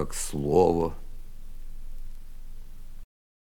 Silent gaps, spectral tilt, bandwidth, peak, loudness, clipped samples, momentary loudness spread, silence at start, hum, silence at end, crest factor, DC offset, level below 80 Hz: none; -6 dB/octave; 18 kHz; -8 dBFS; -25 LUFS; under 0.1%; 28 LU; 0 s; none; 0.55 s; 20 dB; under 0.1%; -38 dBFS